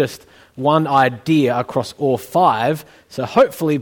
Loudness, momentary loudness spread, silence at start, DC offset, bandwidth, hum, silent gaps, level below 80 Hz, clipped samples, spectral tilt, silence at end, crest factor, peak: -17 LUFS; 11 LU; 0 s; under 0.1%; 19 kHz; none; none; -58 dBFS; under 0.1%; -6.5 dB/octave; 0 s; 16 dB; 0 dBFS